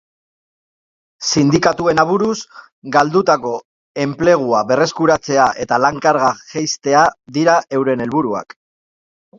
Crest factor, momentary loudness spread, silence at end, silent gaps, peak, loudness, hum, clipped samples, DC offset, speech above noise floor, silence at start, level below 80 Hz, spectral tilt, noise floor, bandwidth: 16 dB; 10 LU; 0.95 s; 2.72-2.82 s, 3.65-3.95 s; 0 dBFS; -15 LUFS; none; under 0.1%; under 0.1%; over 75 dB; 1.2 s; -52 dBFS; -4.5 dB/octave; under -90 dBFS; 7.8 kHz